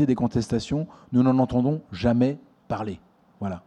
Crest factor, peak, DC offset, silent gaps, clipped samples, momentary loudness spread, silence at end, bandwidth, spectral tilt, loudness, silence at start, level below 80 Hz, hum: 16 dB; -8 dBFS; under 0.1%; none; under 0.1%; 14 LU; 0.05 s; 9.4 kHz; -8 dB/octave; -25 LUFS; 0 s; -48 dBFS; none